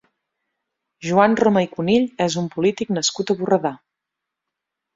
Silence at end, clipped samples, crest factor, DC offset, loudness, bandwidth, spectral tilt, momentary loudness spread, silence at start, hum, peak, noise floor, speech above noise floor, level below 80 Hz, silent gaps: 1.2 s; under 0.1%; 20 dB; under 0.1%; -19 LUFS; 7.8 kHz; -5 dB/octave; 6 LU; 1 s; none; -2 dBFS; -83 dBFS; 64 dB; -60 dBFS; none